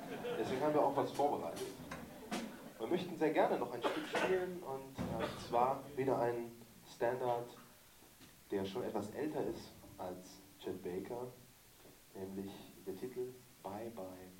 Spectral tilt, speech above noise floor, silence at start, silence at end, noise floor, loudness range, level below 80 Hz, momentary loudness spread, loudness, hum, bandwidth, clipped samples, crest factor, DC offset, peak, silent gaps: -5.5 dB/octave; 23 dB; 0 s; 0 s; -62 dBFS; 10 LU; -68 dBFS; 20 LU; -40 LUFS; none; 16.5 kHz; under 0.1%; 22 dB; under 0.1%; -18 dBFS; none